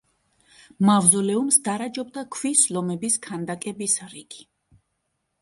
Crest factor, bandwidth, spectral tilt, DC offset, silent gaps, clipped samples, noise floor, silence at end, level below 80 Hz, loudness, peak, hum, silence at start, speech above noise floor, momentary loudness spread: 22 dB; 11.5 kHz; -3.5 dB/octave; under 0.1%; none; under 0.1%; -76 dBFS; 1 s; -68 dBFS; -21 LUFS; -2 dBFS; none; 0.8 s; 53 dB; 16 LU